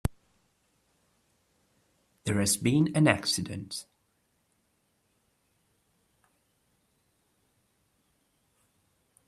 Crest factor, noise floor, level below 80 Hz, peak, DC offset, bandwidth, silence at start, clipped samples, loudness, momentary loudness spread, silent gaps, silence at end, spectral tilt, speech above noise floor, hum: 28 dB; -74 dBFS; -56 dBFS; -6 dBFS; under 0.1%; 15 kHz; 0.05 s; under 0.1%; -27 LUFS; 15 LU; none; 5.45 s; -4.5 dB/octave; 47 dB; none